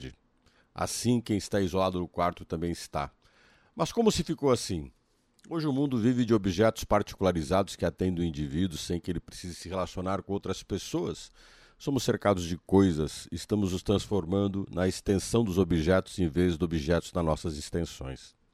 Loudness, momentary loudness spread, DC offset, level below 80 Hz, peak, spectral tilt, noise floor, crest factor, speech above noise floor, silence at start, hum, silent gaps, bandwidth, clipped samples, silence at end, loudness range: -29 LUFS; 11 LU; under 0.1%; -48 dBFS; -10 dBFS; -6 dB/octave; -66 dBFS; 20 dB; 37 dB; 0 s; none; none; 15.5 kHz; under 0.1%; 0.25 s; 5 LU